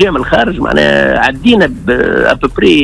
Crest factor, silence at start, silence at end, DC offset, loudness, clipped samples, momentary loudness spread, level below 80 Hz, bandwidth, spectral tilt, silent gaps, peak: 10 dB; 0 s; 0 s; under 0.1%; -10 LUFS; 0.4%; 3 LU; -28 dBFS; 11 kHz; -5.5 dB/octave; none; 0 dBFS